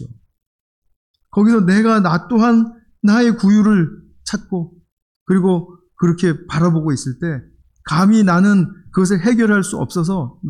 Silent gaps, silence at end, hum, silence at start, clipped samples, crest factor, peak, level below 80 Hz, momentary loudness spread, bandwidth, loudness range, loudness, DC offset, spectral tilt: 0.47-0.82 s, 0.96-1.14 s, 4.92-5.26 s; 0 s; none; 0 s; under 0.1%; 10 dB; -4 dBFS; -50 dBFS; 12 LU; 11.5 kHz; 5 LU; -16 LUFS; under 0.1%; -7 dB/octave